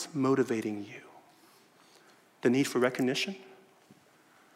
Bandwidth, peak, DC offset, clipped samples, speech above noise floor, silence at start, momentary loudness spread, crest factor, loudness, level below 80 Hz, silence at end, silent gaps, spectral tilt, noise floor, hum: 16 kHz; -14 dBFS; under 0.1%; under 0.1%; 33 dB; 0 s; 18 LU; 20 dB; -30 LUFS; -84 dBFS; 1 s; none; -5 dB/octave; -62 dBFS; none